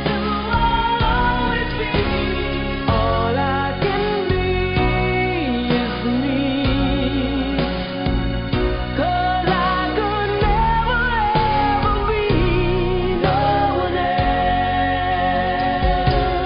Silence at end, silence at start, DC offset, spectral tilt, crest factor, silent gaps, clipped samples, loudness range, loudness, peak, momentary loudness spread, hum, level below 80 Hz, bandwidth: 0 s; 0 s; under 0.1%; -11.5 dB/octave; 14 dB; none; under 0.1%; 2 LU; -19 LUFS; -4 dBFS; 4 LU; none; -26 dBFS; 5.4 kHz